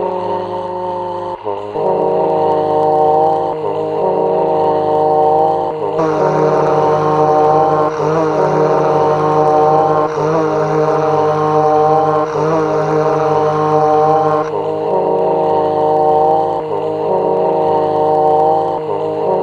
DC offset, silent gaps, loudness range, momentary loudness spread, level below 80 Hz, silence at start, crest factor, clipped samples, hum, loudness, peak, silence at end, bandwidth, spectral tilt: under 0.1%; none; 2 LU; 7 LU; -50 dBFS; 0 s; 12 dB; under 0.1%; none; -14 LUFS; 0 dBFS; 0 s; 7.2 kHz; -7.5 dB/octave